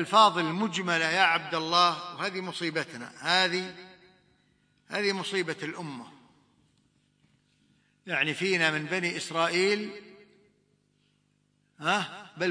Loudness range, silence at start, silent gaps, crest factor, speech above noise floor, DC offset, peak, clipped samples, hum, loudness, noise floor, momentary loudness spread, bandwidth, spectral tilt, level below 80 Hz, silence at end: 9 LU; 0 s; none; 24 dB; 43 dB; under 0.1%; -6 dBFS; under 0.1%; 50 Hz at -65 dBFS; -27 LUFS; -71 dBFS; 15 LU; 10.5 kHz; -3.5 dB/octave; -78 dBFS; 0 s